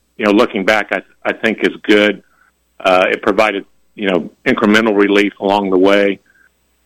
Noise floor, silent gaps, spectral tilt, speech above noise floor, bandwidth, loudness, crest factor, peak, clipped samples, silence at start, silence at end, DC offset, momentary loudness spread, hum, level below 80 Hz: -56 dBFS; none; -5 dB/octave; 42 dB; 15.5 kHz; -14 LUFS; 14 dB; 0 dBFS; under 0.1%; 0.2 s; 0.7 s; under 0.1%; 9 LU; none; -54 dBFS